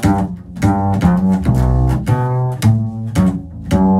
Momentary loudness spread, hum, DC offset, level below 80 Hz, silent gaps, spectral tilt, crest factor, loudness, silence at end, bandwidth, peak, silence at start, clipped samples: 5 LU; none; under 0.1%; -24 dBFS; none; -8 dB/octave; 14 dB; -16 LUFS; 0 s; 13.5 kHz; 0 dBFS; 0 s; under 0.1%